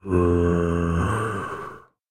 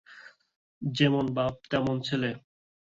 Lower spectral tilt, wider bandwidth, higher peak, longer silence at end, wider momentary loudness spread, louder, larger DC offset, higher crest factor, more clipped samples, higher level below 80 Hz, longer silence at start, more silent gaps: first, -8 dB/octave vs -6.5 dB/octave; first, 10.5 kHz vs 7.8 kHz; about the same, -8 dBFS vs -10 dBFS; second, 0.3 s vs 0.5 s; first, 14 LU vs 10 LU; first, -23 LUFS vs -28 LUFS; neither; about the same, 16 dB vs 20 dB; neither; first, -36 dBFS vs -60 dBFS; about the same, 0.05 s vs 0.1 s; second, none vs 0.56-0.81 s